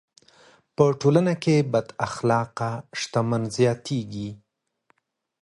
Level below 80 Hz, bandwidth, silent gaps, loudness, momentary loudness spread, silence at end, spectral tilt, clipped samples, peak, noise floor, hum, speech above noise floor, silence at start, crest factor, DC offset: -60 dBFS; 11.5 kHz; none; -24 LUFS; 11 LU; 1.05 s; -6.5 dB/octave; under 0.1%; -4 dBFS; -68 dBFS; none; 45 dB; 0.8 s; 20 dB; under 0.1%